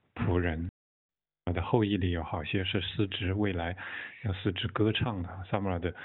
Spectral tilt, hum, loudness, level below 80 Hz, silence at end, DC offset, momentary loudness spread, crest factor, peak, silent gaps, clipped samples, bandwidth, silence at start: -5 dB/octave; none; -32 LUFS; -48 dBFS; 0 s; under 0.1%; 9 LU; 22 dB; -10 dBFS; 0.69-1.09 s; under 0.1%; 4.2 kHz; 0.15 s